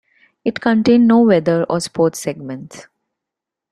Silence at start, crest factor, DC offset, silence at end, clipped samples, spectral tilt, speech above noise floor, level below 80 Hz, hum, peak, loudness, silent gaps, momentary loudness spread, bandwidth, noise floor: 0.45 s; 16 dB; under 0.1%; 0.9 s; under 0.1%; -6 dB/octave; 69 dB; -56 dBFS; none; -2 dBFS; -15 LUFS; none; 16 LU; 13 kHz; -84 dBFS